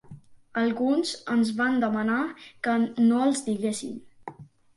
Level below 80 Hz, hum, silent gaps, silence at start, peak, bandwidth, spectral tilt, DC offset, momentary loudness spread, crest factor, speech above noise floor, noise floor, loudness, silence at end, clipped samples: -68 dBFS; none; none; 0.1 s; -12 dBFS; 11.5 kHz; -4.5 dB/octave; under 0.1%; 16 LU; 14 dB; 23 dB; -48 dBFS; -26 LUFS; 0.35 s; under 0.1%